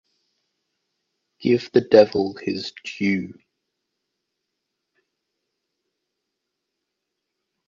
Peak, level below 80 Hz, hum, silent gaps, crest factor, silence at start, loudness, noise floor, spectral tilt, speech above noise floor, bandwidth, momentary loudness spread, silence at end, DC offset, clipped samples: 0 dBFS; -68 dBFS; none; none; 24 dB; 1.4 s; -20 LUFS; -81 dBFS; -6.5 dB/octave; 61 dB; 7.4 kHz; 14 LU; 4.35 s; under 0.1%; under 0.1%